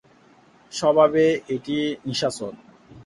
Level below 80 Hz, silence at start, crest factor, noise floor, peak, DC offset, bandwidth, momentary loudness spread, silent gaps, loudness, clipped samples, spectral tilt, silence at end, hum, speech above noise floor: -62 dBFS; 0.7 s; 20 dB; -54 dBFS; -4 dBFS; under 0.1%; 11.5 kHz; 16 LU; none; -21 LUFS; under 0.1%; -5 dB/octave; 0 s; none; 33 dB